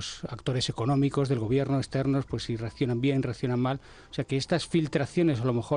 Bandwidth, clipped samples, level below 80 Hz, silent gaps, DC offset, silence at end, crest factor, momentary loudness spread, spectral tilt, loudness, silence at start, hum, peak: 10 kHz; under 0.1%; -52 dBFS; none; under 0.1%; 0 s; 14 dB; 8 LU; -6.5 dB/octave; -28 LUFS; 0 s; none; -14 dBFS